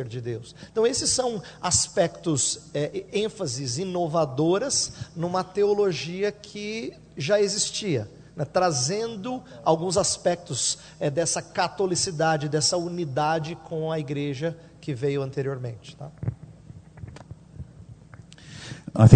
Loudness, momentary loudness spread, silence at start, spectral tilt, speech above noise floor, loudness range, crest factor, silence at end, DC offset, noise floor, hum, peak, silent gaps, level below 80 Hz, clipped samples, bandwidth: -26 LUFS; 17 LU; 0 s; -4.5 dB/octave; 21 dB; 8 LU; 26 dB; 0 s; under 0.1%; -47 dBFS; none; 0 dBFS; none; -54 dBFS; under 0.1%; 9.4 kHz